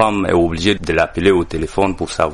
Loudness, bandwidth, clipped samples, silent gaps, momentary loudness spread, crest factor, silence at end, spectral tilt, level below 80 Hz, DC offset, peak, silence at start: -16 LUFS; 11.5 kHz; under 0.1%; none; 4 LU; 16 dB; 0 s; -5.5 dB/octave; -34 dBFS; under 0.1%; 0 dBFS; 0 s